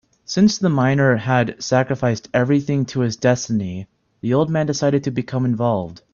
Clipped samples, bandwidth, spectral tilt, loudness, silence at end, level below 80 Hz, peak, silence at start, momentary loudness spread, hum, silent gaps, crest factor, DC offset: under 0.1%; 7.2 kHz; -6 dB/octave; -19 LUFS; 0.2 s; -54 dBFS; -2 dBFS; 0.3 s; 7 LU; none; none; 18 dB; under 0.1%